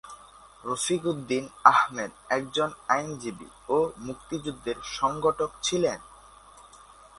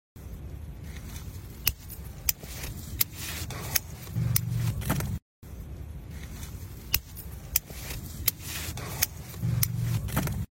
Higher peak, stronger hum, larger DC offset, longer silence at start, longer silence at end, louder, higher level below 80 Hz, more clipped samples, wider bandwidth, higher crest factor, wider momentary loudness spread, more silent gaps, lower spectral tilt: about the same, -2 dBFS vs -2 dBFS; neither; neither; about the same, 0.05 s vs 0.15 s; first, 0.55 s vs 0.1 s; first, -27 LUFS vs -31 LUFS; second, -58 dBFS vs -42 dBFS; neither; second, 11.5 kHz vs 16.5 kHz; about the same, 28 dB vs 32 dB; first, 18 LU vs 15 LU; second, none vs 5.22-5.42 s; about the same, -3.5 dB/octave vs -3.5 dB/octave